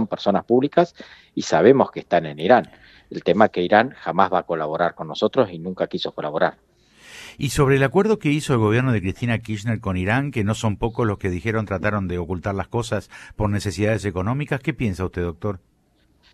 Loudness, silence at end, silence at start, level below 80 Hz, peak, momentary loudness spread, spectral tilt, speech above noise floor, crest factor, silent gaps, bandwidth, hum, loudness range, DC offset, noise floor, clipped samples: -21 LUFS; 0.75 s; 0 s; -46 dBFS; 0 dBFS; 9 LU; -6.5 dB/octave; 40 dB; 22 dB; none; 14 kHz; none; 5 LU; under 0.1%; -61 dBFS; under 0.1%